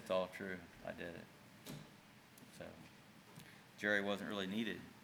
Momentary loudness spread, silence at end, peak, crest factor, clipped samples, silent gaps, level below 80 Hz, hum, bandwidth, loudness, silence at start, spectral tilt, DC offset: 22 LU; 0 s; -22 dBFS; 24 dB; under 0.1%; none; -80 dBFS; none; over 20 kHz; -43 LUFS; 0 s; -5 dB/octave; under 0.1%